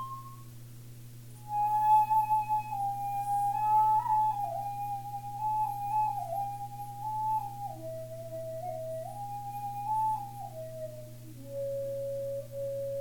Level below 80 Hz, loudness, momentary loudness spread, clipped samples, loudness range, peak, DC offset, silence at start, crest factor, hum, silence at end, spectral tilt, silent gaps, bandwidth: -60 dBFS; -32 LUFS; 19 LU; under 0.1%; 9 LU; -16 dBFS; under 0.1%; 0 s; 16 dB; none; 0 s; -6 dB/octave; none; 17.5 kHz